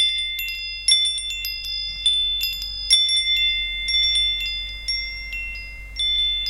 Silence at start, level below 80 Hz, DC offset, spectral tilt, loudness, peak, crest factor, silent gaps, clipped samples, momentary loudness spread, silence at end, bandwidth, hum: 0 s; -40 dBFS; under 0.1%; 2 dB/octave; -20 LUFS; -4 dBFS; 20 dB; none; under 0.1%; 12 LU; 0 s; 17 kHz; none